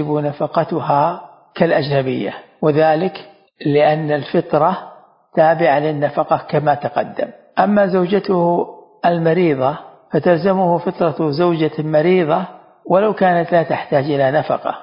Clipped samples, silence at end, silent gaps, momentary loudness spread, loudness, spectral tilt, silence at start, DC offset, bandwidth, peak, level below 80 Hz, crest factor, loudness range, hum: under 0.1%; 0 s; none; 8 LU; -16 LUFS; -12 dB/octave; 0 s; under 0.1%; 5.4 kHz; 0 dBFS; -60 dBFS; 16 dB; 1 LU; none